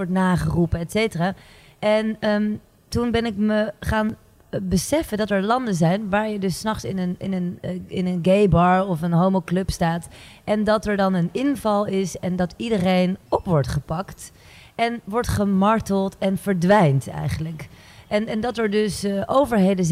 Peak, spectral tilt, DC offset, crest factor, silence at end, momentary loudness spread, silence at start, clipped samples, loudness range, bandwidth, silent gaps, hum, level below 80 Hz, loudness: -4 dBFS; -6.5 dB/octave; under 0.1%; 16 dB; 0 s; 11 LU; 0 s; under 0.1%; 3 LU; 15.5 kHz; none; none; -40 dBFS; -22 LUFS